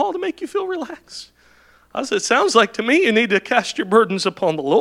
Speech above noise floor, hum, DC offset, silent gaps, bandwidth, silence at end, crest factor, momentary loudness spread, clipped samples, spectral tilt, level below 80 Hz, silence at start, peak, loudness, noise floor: 34 dB; none; under 0.1%; none; 13 kHz; 0 s; 18 dB; 16 LU; under 0.1%; -3.5 dB/octave; -64 dBFS; 0 s; 0 dBFS; -18 LUFS; -52 dBFS